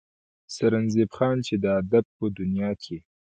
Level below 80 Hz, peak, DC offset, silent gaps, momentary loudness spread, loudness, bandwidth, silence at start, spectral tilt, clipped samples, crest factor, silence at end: -54 dBFS; -8 dBFS; under 0.1%; 2.05-2.20 s; 10 LU; -25 LUFS; 9.2 kHz; 0.5 s; -7 dB/octave; under 0.1%; 18 dB; 0.25 s